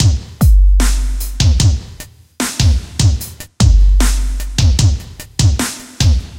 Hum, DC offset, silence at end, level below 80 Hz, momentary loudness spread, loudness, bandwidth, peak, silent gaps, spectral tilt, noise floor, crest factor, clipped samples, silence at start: none; under 0.1%; 0 s; -14 dBFS; 11 LU; -15 LUFS; 16.5 kHz; 0 dBFS; none; -4.5 dB/octave; -35 dBFS; 12 dB; under 0.1%; 0 s